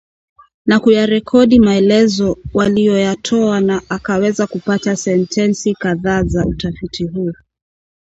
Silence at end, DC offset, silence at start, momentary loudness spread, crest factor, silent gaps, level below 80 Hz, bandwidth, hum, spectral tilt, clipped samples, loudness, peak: 0.8 s; under 0.1%; 0.65 s; 10 LU; 14 dB; none; -36 dBFS; 8 kHz; none; -6 dB/octave; under 0.1%; -14 LUFS; 0 dBFS